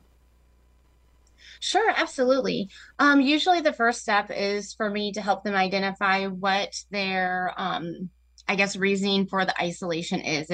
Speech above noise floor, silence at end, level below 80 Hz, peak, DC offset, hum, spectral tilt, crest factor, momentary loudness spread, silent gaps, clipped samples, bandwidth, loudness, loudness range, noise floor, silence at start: 34 dB; 0 s; -60 dBFS; -8 dBFS; under 0.1%; none; -4 dB/octave; 18 dB; 9 LU; none; under 0.1%; 10 kHz; -24 LUFS; 3 LU; -59 dBFS; 1.45 s